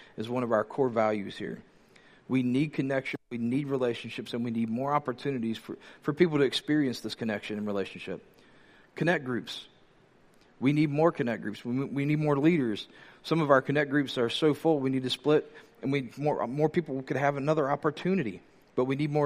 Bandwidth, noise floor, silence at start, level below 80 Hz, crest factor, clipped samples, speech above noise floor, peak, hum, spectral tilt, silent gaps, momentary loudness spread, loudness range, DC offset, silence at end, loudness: 15 kHz; -61 dBFS; 0 s; -70 dBFS; 22 dB; under 0.1%; 32 dB; -6 dBFS; none; -7 dB/octave; none; 12 LU; 5 LU; under 0.1%; 0 s; -29 LUFS